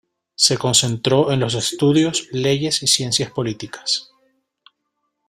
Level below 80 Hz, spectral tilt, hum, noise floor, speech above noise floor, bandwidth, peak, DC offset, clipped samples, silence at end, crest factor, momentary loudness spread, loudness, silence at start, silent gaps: -54 dBFS; -3.5 dB/octave; none; -74 dBFS; 56 dB; 16 kHz; 0 dBFS; under 0.1%; under 0.1%; 1.25 s; 20 dB; 7 LU; -18 LUFS; 0.4 s; none